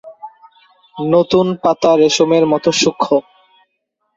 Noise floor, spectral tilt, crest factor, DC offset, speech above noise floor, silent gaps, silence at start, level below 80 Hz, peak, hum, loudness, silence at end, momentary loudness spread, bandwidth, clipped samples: -70 dBFS; -4.5 dB/octave; 14 dB; under 0.1%; 57 dB; none; 0.05 s; -54 dBFS; -2 dBFS; none; -14 LUFS; 0.95 s; 5 LU; 7.8 kHz; under 0.1%